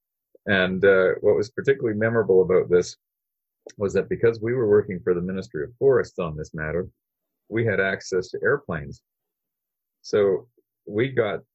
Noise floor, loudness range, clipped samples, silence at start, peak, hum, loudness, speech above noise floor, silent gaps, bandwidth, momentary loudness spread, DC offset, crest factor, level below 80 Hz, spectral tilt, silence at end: -85 dBFS; 6 LU; under 0.1%; 0.45 s; -6 dBFS; none; -23 LUFS; 62 dB; none; 8.2 kHz; 12 LU; under 0.1%; 18 dB; -52 dBFS; -6.5 dB/octave; 0.15 s